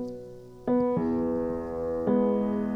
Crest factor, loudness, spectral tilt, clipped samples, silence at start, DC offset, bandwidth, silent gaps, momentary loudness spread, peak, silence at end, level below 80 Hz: 14 dB; -28 LUFS; -10 dB/octave; under 0.1%; 0 s; under 0.1%; 6 kHz; none; 13 LU; -14 dBFS; 0 s; -52 dBFS